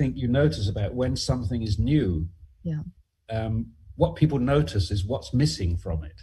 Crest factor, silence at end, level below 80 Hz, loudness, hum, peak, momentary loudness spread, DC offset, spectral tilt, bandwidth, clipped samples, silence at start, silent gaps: 18 dB; 0 s; -38 dBFS; -26 LUFS; none; -6 dBFS; 10 LU; under 0.1%; -7 dB/octave; 12 kHz; under 0.1%; 0 s; none